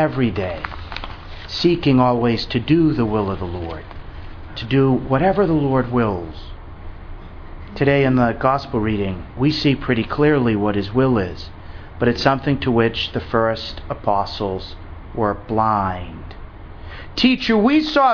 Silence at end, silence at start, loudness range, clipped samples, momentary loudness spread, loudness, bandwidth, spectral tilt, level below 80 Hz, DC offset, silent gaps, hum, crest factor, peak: 0 s; 0 s; 3 LU; under 0.1%; 22 LU; -19 LUFS; 5.4 kHz; -7.5 dB/octave; -36 dBFS; under 0.1%; none; none; 20 dB; 0 dBFS